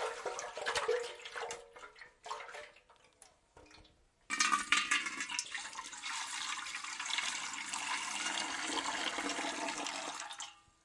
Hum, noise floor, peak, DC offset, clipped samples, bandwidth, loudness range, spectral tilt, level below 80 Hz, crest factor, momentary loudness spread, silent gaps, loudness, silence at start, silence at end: none; -66 dBFS; -14 dBFS; under 0.1%; under 0.1%; 11.5 kHz; 7 LU; 0.5 dB/octave; -74 dBFS; 26 dB; 15 LU; none; -37 LUFS; 0 s; 0.25 s